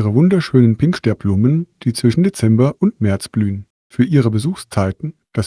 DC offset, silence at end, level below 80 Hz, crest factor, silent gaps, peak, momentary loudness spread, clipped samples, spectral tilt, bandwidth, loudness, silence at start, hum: under 0.1%; 0 s; -48 dBFS; 16 dB; 3.70-3.90 s; 0 dBFS; 9 LU; under 0.1%; -7.5 dB/octave; 11 kHz; -16 LUFS; 0 s; none